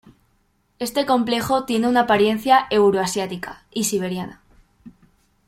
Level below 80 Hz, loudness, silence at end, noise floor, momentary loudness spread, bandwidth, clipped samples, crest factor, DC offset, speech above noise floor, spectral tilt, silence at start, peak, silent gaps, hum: -54 dBFS; -20 LUFS; 0.55 s; -64 dBFS; 14 LU; 16.5 kHz; under 0.1%; 18 dB; under 0.1%; 45 dB; -4 dB/octave; 0.8 s; -2 dBFS; none; none